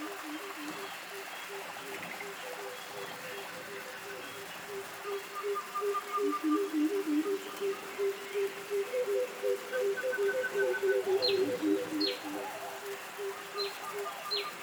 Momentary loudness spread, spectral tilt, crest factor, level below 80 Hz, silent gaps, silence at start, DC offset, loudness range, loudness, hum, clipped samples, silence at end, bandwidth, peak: 10 LU; -3 dB/octave; 16 dB; -82 dBFS; none; 0 s; under 0.1%; 9 LU; -35 LUFS; none; under 0.1%; 0 s; over 20 kHz; -18 dBFS